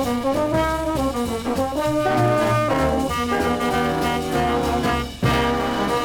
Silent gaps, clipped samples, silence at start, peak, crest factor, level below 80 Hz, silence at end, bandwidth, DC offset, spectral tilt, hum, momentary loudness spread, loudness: none; under 0.1%; 0 s; -6 dBFS; 14 dB; -36 dBFS; 0 s; 19.5 kHz; under 0.1%; -5.5 dB/octave; none; 4 LU; -21 LUFS